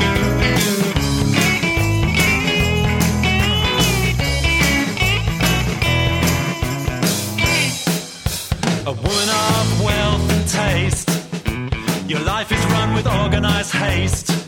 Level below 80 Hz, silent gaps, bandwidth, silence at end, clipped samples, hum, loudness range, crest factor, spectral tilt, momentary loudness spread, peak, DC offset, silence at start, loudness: -28 dBFS; none; 17.5 kHz; 0 s; under 0.1%; none; 3 LU; 16 dB; -4 dB/octave; 6 LU; -2 dBFS; under 0.1%; 0 s; -17 LUFS